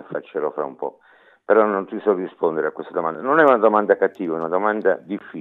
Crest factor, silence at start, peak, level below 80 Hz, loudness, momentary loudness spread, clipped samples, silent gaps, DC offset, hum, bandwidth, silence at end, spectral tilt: 18 dB; 0.1 s; -2 dBFS; -86 dBFS; -20 LUFS; 13 LU; under 0.1%; none; under 0.1%; none; 4.1 kHz; 0 s; -8.5 dB/octave